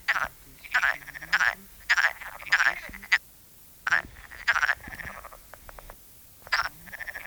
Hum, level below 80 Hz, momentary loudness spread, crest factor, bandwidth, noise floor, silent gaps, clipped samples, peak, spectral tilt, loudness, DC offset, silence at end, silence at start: none; -54 dBFS; 23 LU; 24 dB; over 20 kHz; -52 dBFS; none; under 0.1%; -6 dBFS; -0.5 dB/octave; -26 LUFS; under 0.1%; 0 s; 0 s